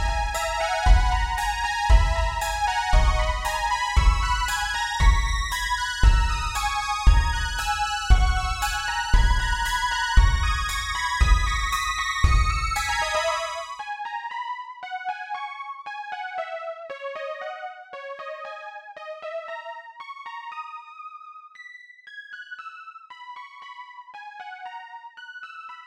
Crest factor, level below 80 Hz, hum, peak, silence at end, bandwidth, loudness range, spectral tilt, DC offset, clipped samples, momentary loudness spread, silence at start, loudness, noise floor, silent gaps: 20 dB; -26 dBFS; none; -4 dBFS; 0 s; 15.5 kHz; 16 LU; -3 dB/octave; under 0.1%; under 0.1%; 19 LU; 0 s; -25 LUFS; -45 dBFS; none